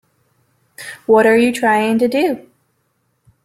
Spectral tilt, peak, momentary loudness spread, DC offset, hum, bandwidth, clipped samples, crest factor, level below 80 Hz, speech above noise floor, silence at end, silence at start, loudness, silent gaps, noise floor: -5 dB/octave; -2 dBFS; 18 LU; under 0.1%; none; 15 kHz; under 0.1%; 16 dB; -60 dBFS; 52 dB; 1.05 s; 0.8 s; -14 LUFS; none; -65 dBFS